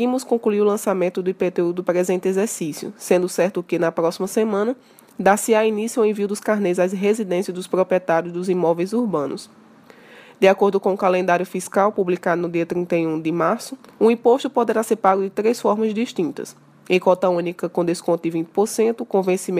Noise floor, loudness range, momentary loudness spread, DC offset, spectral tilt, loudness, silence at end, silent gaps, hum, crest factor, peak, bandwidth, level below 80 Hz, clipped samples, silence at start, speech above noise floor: -47 dBFS; 2 LU; 6 LU; under 0.1%; -5.5 dB/octave; -20 LUFS; 0 s; none; none; 18 dB; -2 dBFS; 15.5 kHz; -70 dBFS; under 0.1%; 0 s; 28 dB